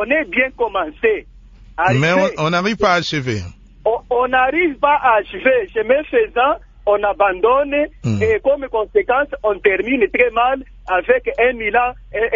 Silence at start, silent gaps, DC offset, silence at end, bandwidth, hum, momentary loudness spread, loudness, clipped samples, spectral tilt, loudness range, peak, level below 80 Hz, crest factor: 0 s; none; under 0.1%; 0 s; 7.6 kHz; none; 6 LU; -17 LUFS; under 0.1%; -6 dB/octave; 1 LU; 0 dBFS; -42 dBFS; 16 dB